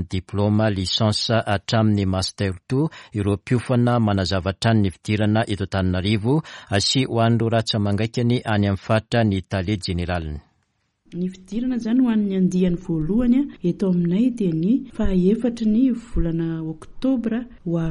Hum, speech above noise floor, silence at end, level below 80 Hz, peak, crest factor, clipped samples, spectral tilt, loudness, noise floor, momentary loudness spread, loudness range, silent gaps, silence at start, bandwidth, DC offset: none; 49 dB; 0 s; -38 dBFS; -4 dBFS; 18 dB; under 0.1%; -6.5 dB/octave; -21 LUFS; -69 dBFS; 7 LU; 3 LU; none; 0 s; 11.5 kHz; under 0.1%